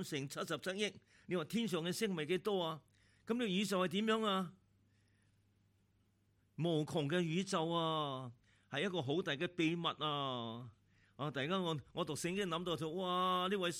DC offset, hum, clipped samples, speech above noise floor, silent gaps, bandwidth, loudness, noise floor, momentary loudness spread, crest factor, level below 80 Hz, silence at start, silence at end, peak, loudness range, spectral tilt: under 0.1%; none; under 0.1%; 37 dB; none; 16 kHz; -39 LUFS; -75 dBFS; 8 LU; 18 dB; -78 dBFS; 0 s; 0 s; -22 dBFS; 3 LU; -5 dB/octave